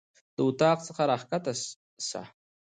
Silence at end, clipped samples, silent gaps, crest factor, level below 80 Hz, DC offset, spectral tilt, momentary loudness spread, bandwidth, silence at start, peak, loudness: 0.35 s; under 0.1%; 1.76-1.97 s; 18 dB; -72 dBFS; under 0.1%; -4.5 dB/octave; 14 LU; 9.6 kHz; 0.4 s; -12 dBFS; -29 LUFS